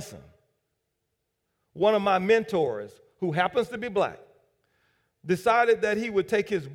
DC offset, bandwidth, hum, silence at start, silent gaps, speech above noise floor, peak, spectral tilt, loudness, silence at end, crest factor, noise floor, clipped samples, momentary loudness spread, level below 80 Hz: under 0.1%; 16 kHz; none; 0 s; none; 54 dB; -10 dBFS; -5.5 dB/octave; -25 LUFS; 0 s; 18 dB; -80 dBFS; under 0.1%; 11 LU; -64 dBFS